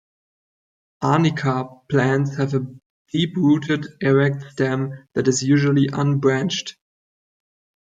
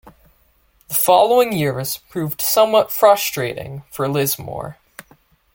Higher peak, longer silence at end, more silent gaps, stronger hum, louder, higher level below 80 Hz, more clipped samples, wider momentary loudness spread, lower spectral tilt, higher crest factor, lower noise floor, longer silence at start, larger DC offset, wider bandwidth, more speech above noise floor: second, -4 dBFS vs 0 dBFS; first, 1.15 s vs 0.8 s; first, 2.86-3.05 s vs none; neither; second, -20 LUFS vs -17 LUFS; second, -60 dBFS vs -54 dBFS; neither; second, 9 LU vs 17 LU; first, -6 dB/octave vs -4 dB/octave; about the same, 16 dB vs 18 dB; first, under -90 dBFS vs -58 dBFS; first, 1 s vs 0.05 s; neither; second, 8.8 kHz vs 17 kHz; first, over 71 dB vs 41 dB